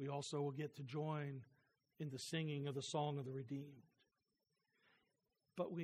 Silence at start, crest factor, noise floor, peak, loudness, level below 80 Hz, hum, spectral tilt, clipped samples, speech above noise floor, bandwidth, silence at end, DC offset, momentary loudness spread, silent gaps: 0 s; 18 dB; -89 dBFS; -28 dBFS; -46 LUFS; -90 dBFS; none; -5.5 dB/octave; under 0.1%; 43 dB; 13.5 kHz; 0 s; under 0.1%; 9 LU; none